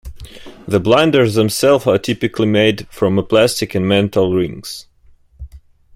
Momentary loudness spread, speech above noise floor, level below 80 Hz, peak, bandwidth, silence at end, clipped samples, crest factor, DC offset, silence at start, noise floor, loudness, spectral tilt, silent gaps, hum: 13 LU; 34 dB; -42 dBFS; 0 dBFS; 16.5 kHz; 0.4 s; under 0.1%; 14 dB; under 0.1%; 0.05 s; -48 dBFS; -15 LUFS; -5.5 dB/octave; none; none